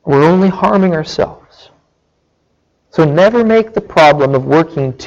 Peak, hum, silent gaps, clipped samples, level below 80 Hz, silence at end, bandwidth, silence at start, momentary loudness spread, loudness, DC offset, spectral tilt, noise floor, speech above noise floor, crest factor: 0 dBFS; none; none; under 0.1%; -44 dBFS; 0 s; 8 kHz; 0.05 s; 9 LU; -11 LUFS; under 0.1%; -7 dB/octave; -61 dBFS; 50 dB; 12 dB